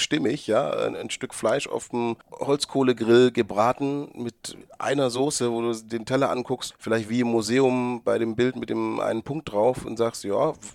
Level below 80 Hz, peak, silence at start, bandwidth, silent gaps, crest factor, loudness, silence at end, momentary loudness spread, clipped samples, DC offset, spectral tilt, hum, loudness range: -60 dBFS; -8 dBFS; 0 s; 14.5 kHz; none; 18 dB; -25 LUFS; 0 s; 9 LU; under 0.1%; under 0.1%; -5 dB/octave; none; 2 LU